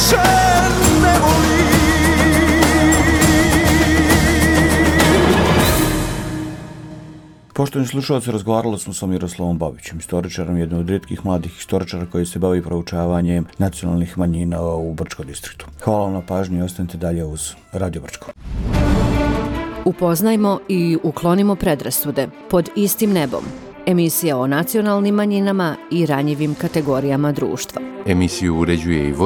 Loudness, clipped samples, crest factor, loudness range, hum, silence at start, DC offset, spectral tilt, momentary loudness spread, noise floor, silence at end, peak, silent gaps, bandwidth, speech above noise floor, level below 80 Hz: -17 LUFS; under 0.1%; 16 dB; 9 LU; none; 0 s; under 0.1%; -5 dB/octave; 13 LU; -39 dBFS; 0 s; 0 dBFS; none; 19 kHz; 21 dB; -28 dBFS